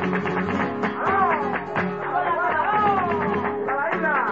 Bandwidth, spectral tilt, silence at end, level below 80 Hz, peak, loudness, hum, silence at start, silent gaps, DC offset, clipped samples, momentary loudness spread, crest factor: 7.6 kHz; -7.5 dB/octave; 0 s; -58 dBFS; -8 dBFS; -23 LUFS; none; 0 s; none; 0.2%; under 0.1%; 5 LU; 14 dB